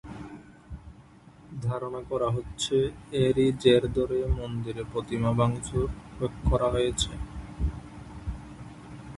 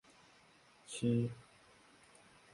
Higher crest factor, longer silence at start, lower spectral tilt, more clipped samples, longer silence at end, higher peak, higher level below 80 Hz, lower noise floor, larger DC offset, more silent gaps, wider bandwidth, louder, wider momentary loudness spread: about the same, 22 dB vs 20 dB; second, 0.05 s vs 0.9 s; about the same, -6 dB/octave vs -6.5 dB/octave; neither; second, 0 s vs 1.15 s; first, -8 dBFS vs -22 dBFS; first, -38 dBFS vs -72 dBFS; second, -52 dBFS vs -66 dBFS; neither; neither; about the same, 11.5 kHz vs 11.5 kHz; first, -28 LUFS vs -38 LUFS; second, 21 LU vs 27 LU